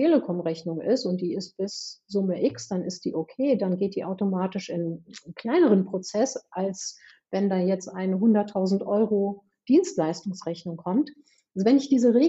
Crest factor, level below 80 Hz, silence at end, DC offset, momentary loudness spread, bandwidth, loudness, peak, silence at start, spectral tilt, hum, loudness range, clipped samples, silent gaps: 16 dB; -74 dBFS; 0 s; under 0.1%; 12 LU; 8 kHz; -26 LUFS; -8 dBFS; 0 s; -6.5 dB/octave; none; 3 LU; under 0.1%; none